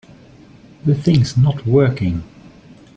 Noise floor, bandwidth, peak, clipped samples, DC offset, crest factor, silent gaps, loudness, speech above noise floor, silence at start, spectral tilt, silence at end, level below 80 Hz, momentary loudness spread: -44 dBFS; 8 kHz; -2 dBFS; under 0.1%; under 0.1%; 16 dB; none; -17 LUFS; 29 dB; 0.85 s; -8 dB/octave; 0.7 s; -44 dBFS; 8 LU